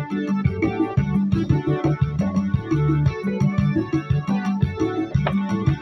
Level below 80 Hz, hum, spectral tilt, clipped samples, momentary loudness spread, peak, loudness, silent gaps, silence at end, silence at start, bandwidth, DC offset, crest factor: -38 dBFS; none; -9 dB/octave; under 0.1%; 3 LU; -6 dBFS; -22 LUFS; none; 0 s; 0 s; 6.2 kHz; under 0.1%; 14 dB